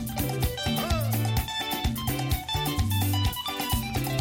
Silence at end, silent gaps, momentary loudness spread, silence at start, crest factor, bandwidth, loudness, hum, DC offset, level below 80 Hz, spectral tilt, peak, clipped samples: 0 s; none; 3 LU; 0 s; 14 dB; 17 kHz; -27 LUFS; none; under 0.1%; -36 dBFS; -4.5 dB/octave; -14 dBFS; under 0.1%